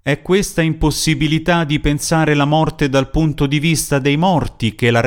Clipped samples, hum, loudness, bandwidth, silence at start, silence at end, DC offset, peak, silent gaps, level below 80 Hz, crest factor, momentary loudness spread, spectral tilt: under 0.1%; none; -16 LUFS; 18 kHz; 0.05 s; 0 s; under 0.1%; -2 dBFS; none; -30 dBFS; 14 dB; 3 LU; -5 dB/octave